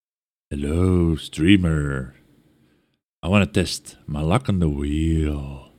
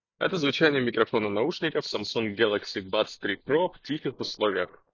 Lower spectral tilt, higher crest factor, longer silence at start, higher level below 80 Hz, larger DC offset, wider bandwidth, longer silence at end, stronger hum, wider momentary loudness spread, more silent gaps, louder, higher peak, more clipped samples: first, -6.5 dB/octave vs -5 dB/octave; about the same, 20 dB vs 20 dB; first, 0.5 s vs 0.2 s; first, -34 dBFS vs -64 dBFS; neither; first, 14 kHz vs 7.4 kHz; about the same, 0.15 s vs 0.25 s; neither; first, 13 LU vs 8 LU; first, 3.04-3.21 s vs none; first, -22 LUFS vs -27 LUFS; first, -2 dBFS vs -8 dBFS; neither